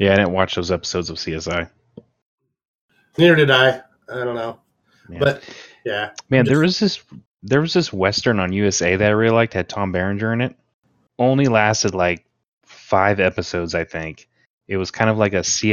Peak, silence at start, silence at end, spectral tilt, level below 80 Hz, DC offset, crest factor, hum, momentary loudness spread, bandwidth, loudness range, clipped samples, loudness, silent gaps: 0 dBFS; 0 s; 0 s; -4.5 dB/octave; -52 dBFS; under 0.1%; 18 dB; none; 14 LU; 13 kHz; 3 LU; under 0.1%; -18 LUFS; 2.22-2.38 s, 2.68-2.89 s, 7.27-7.35 s, 10.74-10.82 s, 12.48-12.61 s, 14.46-14.61 s